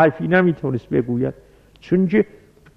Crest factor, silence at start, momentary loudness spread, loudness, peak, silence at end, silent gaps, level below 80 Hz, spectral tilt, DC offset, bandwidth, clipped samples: 16 dB; 0 s; 8 LU; -20 LUFS; -2 dBFS; 0.55 s; none; -52 dBFS; -9.5 dB/octave; under 0.1%; 6 kHz; under 0.1%